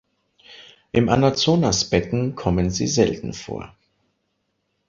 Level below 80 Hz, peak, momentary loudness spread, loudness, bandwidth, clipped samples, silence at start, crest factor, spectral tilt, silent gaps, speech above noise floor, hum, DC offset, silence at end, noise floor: -42 dBFS; -2 dBFS; 13 LU; -20 LUFS; 7.8 kHz; under 0.1%; 0.5 s; 20 dB; -5 dB/octave; none; 53 dB; none; under 0.1%; 1.2 s; -73 dBFS